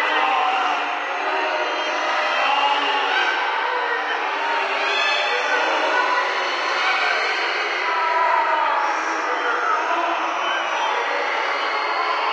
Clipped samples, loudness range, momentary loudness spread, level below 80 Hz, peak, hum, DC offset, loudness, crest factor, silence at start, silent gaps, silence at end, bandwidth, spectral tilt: under 0.1%; 1 LU; 4 LU; -88 dBFS; -8 dBFS; none; under 0.1%; -20 LUFS; 14 dB; 0 s; none; 0 s; 9.4 kHz; 1 dB/octave